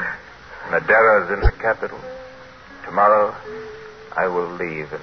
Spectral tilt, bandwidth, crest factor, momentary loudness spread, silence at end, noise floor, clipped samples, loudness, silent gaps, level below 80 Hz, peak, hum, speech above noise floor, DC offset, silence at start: -7 dB/octave; 6.4 kHz; 20 dB; 22 LU; 0 s; -41 dBFS; under 0.1%; -19 LUFS; none; -32 dBFS; -2 dBFS; none; 23 dB; under 0.1%; 0 s